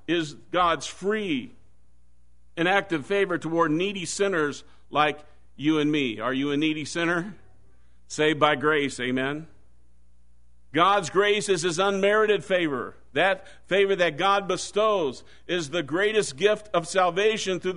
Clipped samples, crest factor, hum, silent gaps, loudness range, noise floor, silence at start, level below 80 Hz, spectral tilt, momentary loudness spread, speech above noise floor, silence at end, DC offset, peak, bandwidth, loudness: under 0.1%; 22 dB; none; none; 4 LU; -62 dBFS; 0.1 s; -60 dBFS; -4 dB/octave; 9 LU; 37 dB; 0 s; 0.5%; -4 dBFS; 11 kHz; -24 LUFS